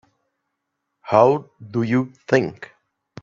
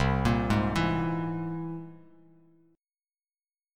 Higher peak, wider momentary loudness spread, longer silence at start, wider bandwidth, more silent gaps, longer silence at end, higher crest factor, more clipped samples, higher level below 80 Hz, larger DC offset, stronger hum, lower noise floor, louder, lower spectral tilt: first, 0 dBFS vs -14 dBFS; about the same, 13 LU vs 14 LU; first, 1.05 s vs 0 s; second, 7.4 kHz vs 14 kHz; neither; second, 0.6 s vs 1.8 s; about the same, 22 dB vs 18 dB; neither; second, -64 dBFS vs -42 dBFS; neither; neither; second, -78 dBFS vs under -90 dBFS; first, -20 LUFS vs -29 LUFS; about the same, -7.5 dB/octave vs -7 dB/octave